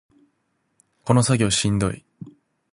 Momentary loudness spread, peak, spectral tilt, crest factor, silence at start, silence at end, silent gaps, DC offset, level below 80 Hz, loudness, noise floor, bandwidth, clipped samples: 16 LU; -2 dBFS; -5 dB/octave; 22 dB; 1.05 s; 0.45 s; none; under 0.1%; -46 dBFS; -20 LUFS; -71 dBFS; 11.5 kHz; under 0.1%